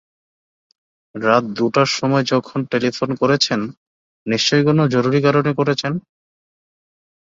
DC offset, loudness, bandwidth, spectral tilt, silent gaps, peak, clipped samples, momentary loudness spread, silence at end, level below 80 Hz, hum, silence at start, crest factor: under 0.1%; -17 LUFS; 7.8 kHz; -5 dB/octave; 3.77-4.26 s; 0 dBFS; under 0.1%; 9 LU; 1.3 s; -60 dBFS; none; 1.15 s; 18 dB